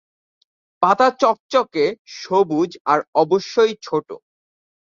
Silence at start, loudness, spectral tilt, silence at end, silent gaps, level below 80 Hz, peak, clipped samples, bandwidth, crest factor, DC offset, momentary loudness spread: 0.8 s; -19 LUFS; -5 dB/octave; 0.7 s; 1.40-1.49 s, 1.99-2.05 s, 2.80-2.85 s, 3.08-3.13 s; -68 dBFS; -2 dBFS; under 0.1%; 7.6 kHz; 18 dB; under 0.1%; 10 LU